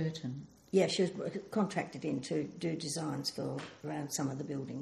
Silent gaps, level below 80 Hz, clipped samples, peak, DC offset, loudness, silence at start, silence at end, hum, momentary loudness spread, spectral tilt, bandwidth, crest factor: none; -74 dBFS; under 0.1%; -16 dBFS; under 0.1%; -36 LUFS; 0 s; 0 s; none; 10 LU; -5 dB/octave; 14.5 kHz; 20 dB